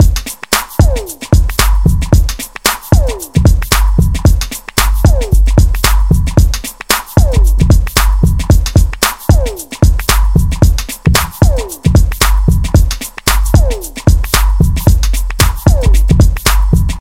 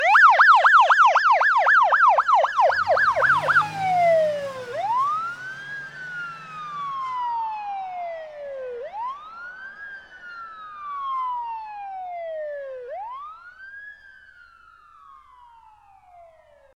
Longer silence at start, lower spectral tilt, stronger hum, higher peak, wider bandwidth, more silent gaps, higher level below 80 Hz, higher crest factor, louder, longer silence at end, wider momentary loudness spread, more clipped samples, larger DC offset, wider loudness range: about the same, 0 s vs 0 s; first, -5 dB/octave vs -2.5 dB/octave; neither; first, 0 dBFS vs -4 dBFS; about the same, 17 kHz vs 16 kHz; neither; first, -12 dBFS vs -66 dBFS; second, 10 dB vs 18 dB; first, -12 LUFS vs -19 LUFS; second, 0 s vs 2.8 s; second, 4 LU vs 24 LU; first, 0.9% vs under 0.1%; first, 0.9% vs under 0.1%; second, 1 LU vs 19 LU